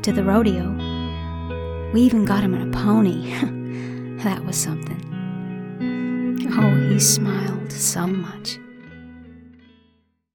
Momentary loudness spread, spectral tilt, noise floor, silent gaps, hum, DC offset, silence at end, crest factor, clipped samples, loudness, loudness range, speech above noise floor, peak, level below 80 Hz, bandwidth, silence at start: 14 LU; -5 dB/octave; -62 dBFS; none; none; under 0.1%; 0.85 s; 18 dB; under 0.1%; -21 LUFS; 5 LU; 43 dB; -4 dBFS; -40 dBFS; 19 kHz; 0 s